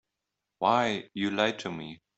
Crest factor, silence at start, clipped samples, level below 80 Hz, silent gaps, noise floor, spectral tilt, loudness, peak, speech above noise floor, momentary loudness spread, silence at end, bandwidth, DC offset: 22 dB; 0.6 s; under 0.1%; -70 dBFS; none; -86 dBFS; -4.5 dB/octave; -29 LUFS; -8 dBFS; 57 dB; 12 LU; 0.25 s; 8.2 kHz; under 0.1%